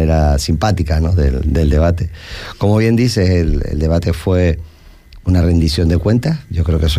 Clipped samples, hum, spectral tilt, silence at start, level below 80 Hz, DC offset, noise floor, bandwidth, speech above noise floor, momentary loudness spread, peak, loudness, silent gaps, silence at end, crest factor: under 0.1%; none; -7 dB/octave; 0 s; -20 dBFS; under 0.1%; -39 dBFS; 14.5 kHz; 26 dB; 6 LU; -4 dBFS; -15 LUFS; none; 0 s; 10 dB